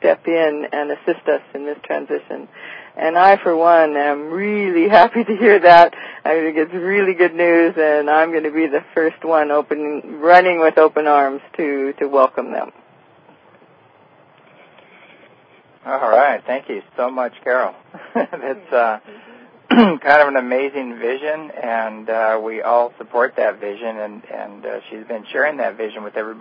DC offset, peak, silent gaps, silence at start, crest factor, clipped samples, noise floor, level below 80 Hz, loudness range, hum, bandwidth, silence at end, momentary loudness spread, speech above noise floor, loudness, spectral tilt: under 0.1%; 0 dBFS; none; 0 s; 16 dB; under 0.1%; -50 dBFS; -64 dBFS; 9 LU; none; 5.8 kHz; 0 s; 15 LU; 34 dB; -16 LUFS; -7 dB/octave